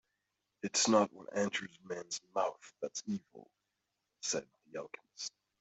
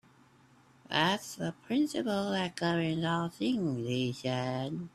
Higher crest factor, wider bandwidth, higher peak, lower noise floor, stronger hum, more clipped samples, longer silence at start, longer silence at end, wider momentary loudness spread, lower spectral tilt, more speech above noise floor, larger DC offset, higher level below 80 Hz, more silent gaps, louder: about the same, 24 dB vs 20 dB; second, 8.2 kHz vs 14.5 kHz; about the same, -14 dBFS vs -12 dBFS; first, -86 dBFS vs -62 dBFS; neither; neither; second, 0.65 s vs 0.9 s; first, 0.3 s vs 0.05 s; first, 17 LU vs 5 LU; second, -2.5 dB/octave vs -5.5 dB/octave; first, 49 dB vs 30 dB; neither; second, -84 dBFS vs -68 dBFS; neither; second, -36 LUFS vs -32 LUFS